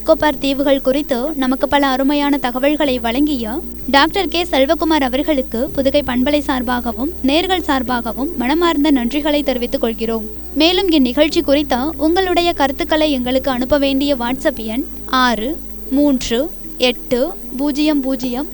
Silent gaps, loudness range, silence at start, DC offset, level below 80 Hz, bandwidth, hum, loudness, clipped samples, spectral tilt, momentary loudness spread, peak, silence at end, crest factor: none; 2 LU; 0 s; under 0.1%; -34 dBFS; over 20 kHz; none; -16 LUFS; under 0.1%; -4.5 dB/octave; 6 LU; 0 dBFS; 0 s; 16 dB